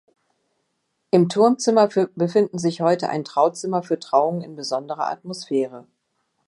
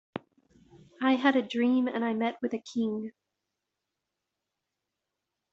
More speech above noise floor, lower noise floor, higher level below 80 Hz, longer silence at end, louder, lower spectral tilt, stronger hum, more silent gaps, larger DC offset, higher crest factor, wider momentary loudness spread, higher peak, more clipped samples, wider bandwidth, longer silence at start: second, 53 dB vs 58 dB; second, -73 dBFS vs -86 dBFS; about the same, -72 dBFS vs -76 dBFS; second, 0.65 s vs 2.45 s; first, -21 LUFS vs -29 LUFS; first, -6 dB/octave vs -3.5 dB/octave; neither; neither; neither; about the same, 18 dB vs 22 dB; second, 10 LU vs 15 LU; first, -2 dBFS vs -8 dBFS; neither; first, 11.5 kHz vs 7.6 kHz; first, 1.15 s vs 0.15 s